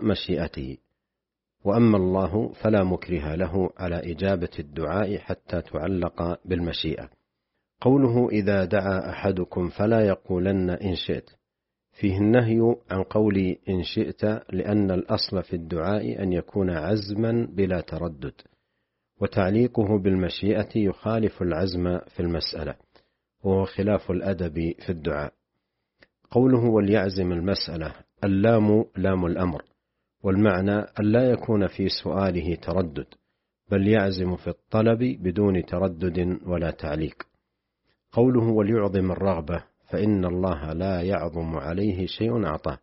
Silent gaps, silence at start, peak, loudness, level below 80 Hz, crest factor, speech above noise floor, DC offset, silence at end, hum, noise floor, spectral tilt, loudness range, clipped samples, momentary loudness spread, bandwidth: none; 0 s; -6 dBFS; -25 LUFS; -46 dBFS; 18 dB; 62 dB; under 0.1%; 0.05 s; none; -86 dBFS; -6.5 dB/octave; 4 LU; under 0.1%; 10 LU; 5.8 kHz